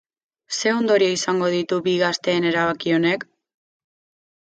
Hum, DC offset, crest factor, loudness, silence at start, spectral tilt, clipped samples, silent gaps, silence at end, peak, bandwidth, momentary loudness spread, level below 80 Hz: none; under 0.1%; 16 dB; -20 LUFS; 0.5 s; -4 dB/octave; under 0.1%; none; 1.2 s; -6 dBFS; 9 kHz; 5 LU; -66 dBFS